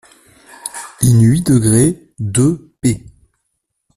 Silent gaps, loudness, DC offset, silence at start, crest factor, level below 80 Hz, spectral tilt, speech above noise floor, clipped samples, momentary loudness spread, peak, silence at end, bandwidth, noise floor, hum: none; -14 LUFS; under 0.1%; 0.65 s; 16 dB; -42 dBFS; -6 dB/octave; 60 dB; under 0.1%; 16 LU; 0 dBFS; 1 s; 14.5 kHz; -71 dBFS; none